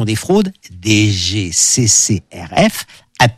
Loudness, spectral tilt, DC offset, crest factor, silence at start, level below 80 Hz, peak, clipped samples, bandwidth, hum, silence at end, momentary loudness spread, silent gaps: -13 LUFS; -3.5 dB/octave; under 0.1%; 14 dB; 0 s; -42 dBFS; 0 dBFS; under 0.1%; 15 kHz; none; 0.05 s; 13 LU; none